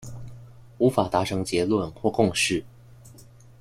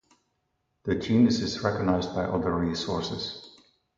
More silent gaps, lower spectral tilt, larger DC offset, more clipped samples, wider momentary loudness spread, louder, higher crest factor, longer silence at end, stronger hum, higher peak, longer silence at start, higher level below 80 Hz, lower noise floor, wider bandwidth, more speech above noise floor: neither; second, -4.5 dB/octave vs -6 dB/octave; neither; neither; first, 16 LU vs 12 LU; first, -24 LUFS vs -27 LUFS; about the same, 20 dB vs 18 dB; about the same, 0.4 s vs 0.5 s; neither; first, -6 dBFS vs -10 dBFS; second, 0 s vs 0.85 s; about the same, -52 dBFS vs -50 dBFS; second, -49 dBFS vs -76 dBFS; first, 16 kHz vs 7.6 kHz; second, 26 dB vs 50 dB